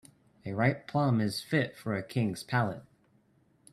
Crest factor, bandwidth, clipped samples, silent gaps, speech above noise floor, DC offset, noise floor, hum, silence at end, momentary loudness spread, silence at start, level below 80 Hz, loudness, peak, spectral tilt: 20 dB; 13 kHz; under 0.1%; none; 37 dB; under 0.1%; -67 dBFS; none; 0.9 s; 9 LU; 0.45 s; -66 dBFS; -31 LUFS; -12 dBFS; -6.5 dB/octave